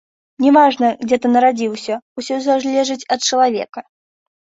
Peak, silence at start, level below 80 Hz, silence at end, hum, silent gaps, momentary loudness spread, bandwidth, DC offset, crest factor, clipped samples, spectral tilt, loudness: -2 dBFS; 0.4 s; -64 dBFS; 0.6 s; none; 2.02-2.16 s, 3.69-3.73 s; 13 LU; 8 kHz; under 0.1%; 16 dB; under 0.1%; -3 dB/octave; -16 LUFS